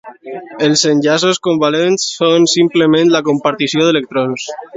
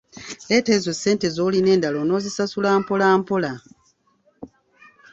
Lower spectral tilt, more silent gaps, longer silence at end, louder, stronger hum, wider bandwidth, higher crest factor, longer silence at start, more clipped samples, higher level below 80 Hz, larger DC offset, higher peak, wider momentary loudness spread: about the same, -4 dB/octave vs -5 dB/octave; neither; second, 0 s vs 0.65 s; first, -12 LUFS vs -20 LUFS; neither; about the same, 8 kHz vs 8 kHz; second, 12 dB vs 18 dB; about the same, 0.05 s vs 0.15 s; neither; about the same, -60 dBFS vs -60 dBFS; neither; first, 0 dBFS vs -4 dBFS; about the same, 8 LU vs 9 LU